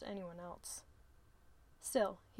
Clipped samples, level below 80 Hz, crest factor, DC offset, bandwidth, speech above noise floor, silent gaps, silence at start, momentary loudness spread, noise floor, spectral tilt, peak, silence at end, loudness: under 0.1%; -68 dBFS; 22 dB; under 0.1%; 16.5 kHz; 23 dB; none; 0 s; 12 LU; -65 dBFS; -3.5 dB/octave; -22 dBFS; 0 s; -42 LUFS